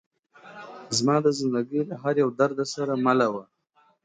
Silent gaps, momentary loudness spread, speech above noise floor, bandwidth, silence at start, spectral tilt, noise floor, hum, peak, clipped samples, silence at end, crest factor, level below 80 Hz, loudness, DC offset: none; 15 LU; 41 dB; 9.6 kHz; 0.45 s; -5 dB/octave; -64 dBFS; none; -8 dBFS; under 0.1%; 0.6 s; 18 dB; -72 dBFS; -24 LUFS; under 0.1%